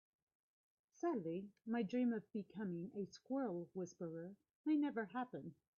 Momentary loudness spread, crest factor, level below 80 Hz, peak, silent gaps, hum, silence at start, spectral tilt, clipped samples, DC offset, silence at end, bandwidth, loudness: 10 LU; 14 dB; -88 dBFS; -30 dBFS; 4.55-4.64 s; none; 1.05 s; -6.5 dB/octave; under 0.1%; under 0.1%; 0.25 s; 6.8 kHz; -44 LUFS